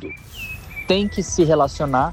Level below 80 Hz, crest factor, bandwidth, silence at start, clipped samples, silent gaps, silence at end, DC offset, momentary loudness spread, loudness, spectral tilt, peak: -38 dBFS; 16 dB; 17 kHz; 0 s; under 0.1%; none; 0 s; under 0.1%; 15 LU; -19 LUFS; -5 dB/octave; -6 dBFS